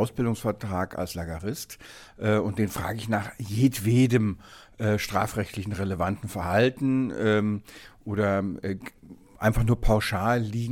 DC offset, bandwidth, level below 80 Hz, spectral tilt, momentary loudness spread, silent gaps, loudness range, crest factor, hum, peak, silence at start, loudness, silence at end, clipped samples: under 0.1%; 17.5 kHz; -40 dBFS; -6.5 dB/octave; 11 LU; none; 3 LU; 18 dB; none; -8 dBFS; 0 s; -27 LUFS; 0 s; under 0.1%